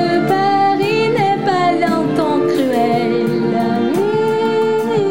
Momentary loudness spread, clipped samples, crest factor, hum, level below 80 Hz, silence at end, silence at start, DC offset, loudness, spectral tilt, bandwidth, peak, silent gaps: 2 LU; under 0.1%; 12 dB; none; -56 dBFS; 0 s; 0 s; 0.7%; -15 LUFS; -6.5 dB/octave; 16.5 kHz; -2 dBFS; none